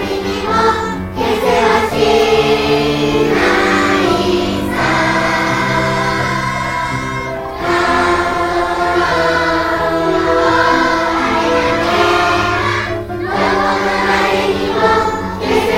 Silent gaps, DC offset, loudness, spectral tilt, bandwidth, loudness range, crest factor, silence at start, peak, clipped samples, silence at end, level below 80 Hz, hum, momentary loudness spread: none; under 0.1%; -14 LUFS; -5 dB/octave; 16.5 kHz; 3 LU; 14 dB; 0 s; 0 dBFS; under 0.1%; 0 s; -34 dBFS; none; 6 LU